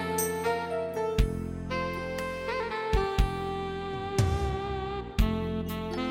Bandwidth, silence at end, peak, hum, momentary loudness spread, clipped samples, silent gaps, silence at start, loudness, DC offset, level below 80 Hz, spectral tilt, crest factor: 16.5 kHz; 0 s; -10 dBFS; none; 5 LU; under 0.1%; none; 0 s; -31 LUFS; under 0.1%; -34 dBFS; -5.5 dB/octave; 20 dB